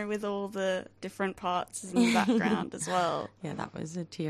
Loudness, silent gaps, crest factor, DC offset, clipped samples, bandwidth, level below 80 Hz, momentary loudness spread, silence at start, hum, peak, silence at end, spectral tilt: -31 LUFS; none; 18 dB; under 0.1%; under 0.1%; 14.5 kHz; -66 dBFS; 13 LU; 0 s; none; -12 dBFS; 0 s; -4.5 dB/octave